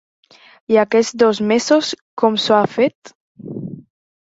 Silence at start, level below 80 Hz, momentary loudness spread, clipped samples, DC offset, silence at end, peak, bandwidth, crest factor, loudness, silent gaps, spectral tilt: 0.7 s; -62 dBFS; 16 LU; under 0.1%; under 0.1%; 0.45 s; -2 dBFS; 8 kHz; 16 dB; -16 LUFS; 2.01-2.17 s, 2.95-3.02 s, 3.15-3.35 s; -4.5 dB/octave